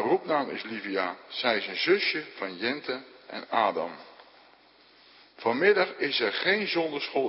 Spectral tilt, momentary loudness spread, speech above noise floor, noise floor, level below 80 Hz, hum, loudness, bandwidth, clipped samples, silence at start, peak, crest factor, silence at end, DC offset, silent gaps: -8 dB/octave; 12 LU; 30 dB; -58 dBFS; -80 dBFS; none; -27 LUFS; 5.8 kHz; under 0.1%; 0 s; -8 dBFS; 20 dB; 0 s; under 0.1%; none